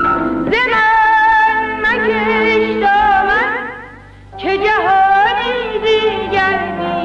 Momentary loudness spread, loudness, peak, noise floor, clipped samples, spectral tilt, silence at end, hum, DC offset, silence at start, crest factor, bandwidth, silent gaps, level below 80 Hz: 8 LU; -13 LUFS; -2 dBFS; -36 dBFS; under 0.1%; -5 dB/octave; 0 s; none; under 0.1%; 0 s; 10 dB; 8.6 kHz; none; -40 dBFS